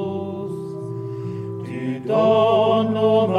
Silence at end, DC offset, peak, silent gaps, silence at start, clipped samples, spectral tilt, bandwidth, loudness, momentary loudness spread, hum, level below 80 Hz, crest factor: 0 s; under 0.1%; -6 dBFS; none; 0 s; under 0.1%; -8 dB/octave; 9.8 kHz; -21 LUFS; 14 LU; none; -66 dBFS; 14 dB